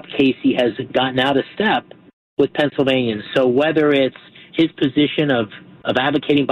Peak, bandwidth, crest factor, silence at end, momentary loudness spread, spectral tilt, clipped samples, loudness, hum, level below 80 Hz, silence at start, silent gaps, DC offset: -4 dBFS; 8.2 kHz; 14 dB; 0 s; 6 LU; -7 dB/octave; under 0.1%; -18 LUFS; none; -56 dBFS; 0.1 s; 2.13-2.37 s; under 0.1%